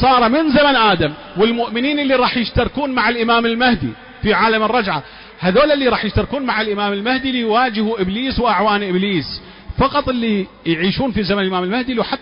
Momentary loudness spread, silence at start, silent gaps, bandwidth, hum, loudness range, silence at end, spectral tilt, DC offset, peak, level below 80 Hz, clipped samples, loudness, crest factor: 8 LU; 0 s; none; 5.4 kHz; none; 3 LU; 0.05 s; -10 dB/octave; under 0.1%; -4 dBFS; -36 dBFS; under 0.1%; -16 LUFS; 12 dB